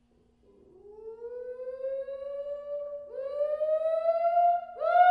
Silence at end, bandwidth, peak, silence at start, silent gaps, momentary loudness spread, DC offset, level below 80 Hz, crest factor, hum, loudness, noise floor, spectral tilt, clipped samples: 0 s; 5 kHz; -10 dBFS; 0.85 s; none; 16 LU; under 0.1%; -72 dBFS; 18 dB; none; -30 LUFS; -64 dBFS; -4 dB/octave; under 0.1%